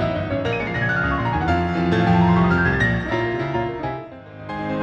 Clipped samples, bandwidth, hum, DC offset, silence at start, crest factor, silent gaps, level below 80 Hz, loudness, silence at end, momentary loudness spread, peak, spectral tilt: under 0.1%; 7 kHz; none; under 0.1%; 0 s; 16 dB; none; -36 dBFS; -20 LUFS; 0 s; 13 LU; -6 dBFS; -8 dB/octave